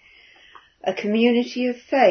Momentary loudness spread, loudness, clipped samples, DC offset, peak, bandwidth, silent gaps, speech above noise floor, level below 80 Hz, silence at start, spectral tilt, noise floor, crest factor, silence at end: 9 LU; -22 LUFS; under 0.1%; under 0.1%; -4 dBFS; 6.6 kHz; none; 32 dB; -70 dBFS; 0.85 s; -5.5 dB/octave; -51 dBFS; 18 dB; 0 s